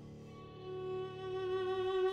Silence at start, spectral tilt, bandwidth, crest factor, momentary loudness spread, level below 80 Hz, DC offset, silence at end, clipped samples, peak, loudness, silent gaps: 0 s; -7 dB/octave; 6.8 kHz; 14 dB; 16 LU; -66 dBFS; under 0.1%; 0 s; under 0.1%; -26 dBFS; -39 LUFS; none